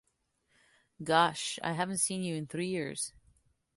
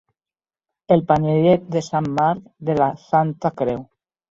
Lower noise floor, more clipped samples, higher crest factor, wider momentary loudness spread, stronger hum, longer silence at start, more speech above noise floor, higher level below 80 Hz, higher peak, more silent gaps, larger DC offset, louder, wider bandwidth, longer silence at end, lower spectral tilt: second, -77 dBFS vs under -90 dBFS; neither; first, 24 dB vs 18 dB; about the same, 10 LU vs 8 LU; neither; about the same, 1 s vs 0.9 s; second, 45 dB vs over 71 dB; second, -70 dBFS vs -54 dBFS; second, -10 dBFS vs -2 dBFS; neither; neither; second, -32 LUFS vs -20 LUFS; first, 12 kHz vs 7.8 kHz; first, 0.65 s vs 0.45 s; second, -3.5 dB/octave vs -8 dB/octave